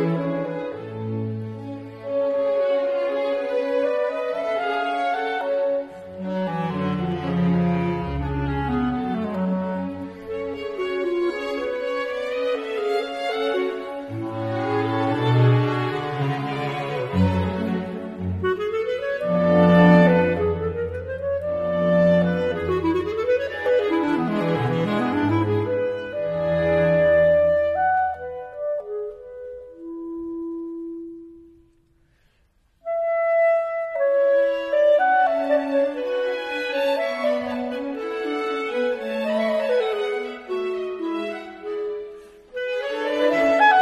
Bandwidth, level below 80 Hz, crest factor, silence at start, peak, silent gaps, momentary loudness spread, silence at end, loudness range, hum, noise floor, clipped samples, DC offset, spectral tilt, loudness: 9.4 kHz; -48 dBFS; 20 dB; 0 s; -2 dBFS; none; 13 LU; 0 s; 7 LU; none; -62 dBFS; under 0.1%; under 0.1%; -8 dB/octave; -23 LUFS